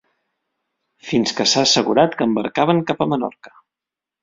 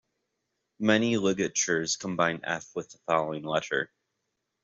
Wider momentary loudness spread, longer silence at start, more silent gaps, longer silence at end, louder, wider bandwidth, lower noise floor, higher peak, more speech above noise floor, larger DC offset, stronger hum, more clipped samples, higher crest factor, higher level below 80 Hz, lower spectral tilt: about the same, 7 LU vs 9 LU; first, 1.05 s vs 0.8 s; neither; about the same, 0.75 s vs 0.8 s; first, -17 LUFS vs -28 LUFS; about the same, 8 kHz vs 8 kHz; first, -87 dBFS vs -81 dBFS; first, -2 dBFS vs -8 dBFS; first, 69 dB vs 53 dB; neither; neither; neither; about the same, 18 dB vs 22 dB; first, -60 dBFS vs -70 dBFS; about the same, -4 dB/octave vs -3.5 dB/octave